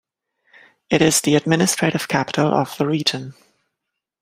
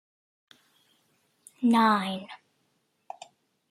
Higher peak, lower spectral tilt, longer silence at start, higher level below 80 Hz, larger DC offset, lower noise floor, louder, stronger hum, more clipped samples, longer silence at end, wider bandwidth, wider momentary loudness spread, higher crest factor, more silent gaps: first, 0 dBFS vs -8 dBFS; second, -4 dB/octave vs -5.5 dB/octave; second, 0.9 s vs 1.6 s; first, -58 dBFS vs -80 dBFS; neither; first, -81 dBFS vs -73 dBFS; first, -18 LUFS vs -25 LUFS; neither; neither; second, 0.9 s vs 1.35 s; first, 16 kHz vs 14.5 kHz; second, 7 LU vs 25 LU; about the same, 20 dB vs 22 dB; neither